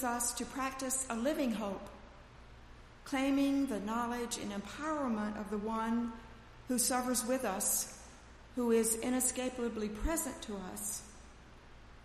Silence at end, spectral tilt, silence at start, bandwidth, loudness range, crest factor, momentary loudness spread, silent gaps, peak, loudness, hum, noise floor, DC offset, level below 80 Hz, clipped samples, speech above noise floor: 0 s; -3 dB/octave; 0 s; 15.5 kHz; 4 LU; 18 dB; 15 LU; none; -20 dBFS; -35 LUFS; none; -55 dBFS; under 0.1%; -54 dBFS; under 0.1%; 20 dB